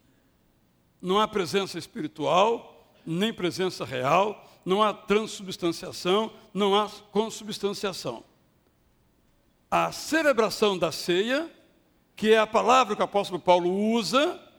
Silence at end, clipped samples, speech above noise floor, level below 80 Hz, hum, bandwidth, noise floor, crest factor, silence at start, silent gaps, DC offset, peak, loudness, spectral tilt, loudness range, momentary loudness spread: 0.2 s; under 0.1%; 40 dB; -64 dBFS; none; 20 kHz; -65 dBFS; 22 dB; 1.05 s; none; under 0.1%; -6 dBFS; -25 LUFS; -4.5 dB/octave; 6 LU; 12 LU